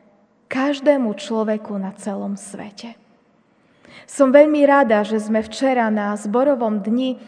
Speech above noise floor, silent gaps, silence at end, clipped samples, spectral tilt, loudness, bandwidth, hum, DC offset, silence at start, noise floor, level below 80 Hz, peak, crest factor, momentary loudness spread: 40 dB; none; 0.05 s; under 0.1%; -5.5 dB/octave; -18 LUFS; 10 kHz; none; under 0.1%; 0.5 s; -58 dBFS; -66 dBFS; 0 dBFS; 18 dB; 19 LU